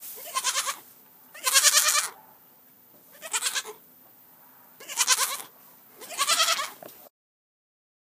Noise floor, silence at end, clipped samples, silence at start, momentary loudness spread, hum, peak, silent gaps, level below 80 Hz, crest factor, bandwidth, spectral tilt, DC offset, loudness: -56 dBFS; 1 s; under 0.1%; 0 s; 25 LU; none; 0 dBFS; none; under -90 dBFS; 28 dB; 15.5 kHz; 3.5 dB/octave; under 0.1%; -23 LUFS